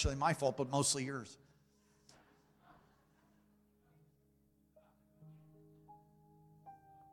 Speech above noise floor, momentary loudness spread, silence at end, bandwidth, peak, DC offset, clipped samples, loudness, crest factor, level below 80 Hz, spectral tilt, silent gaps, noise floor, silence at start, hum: 37 dB; 27 LU; 0.35 s; 16.5 kHz; -18 dBFS; under 0.1%; under 0.1%; -36 LUFS; 24 dB; -58 dBFS; -4 dB/octave; none; -73 dBFS; 0 s; none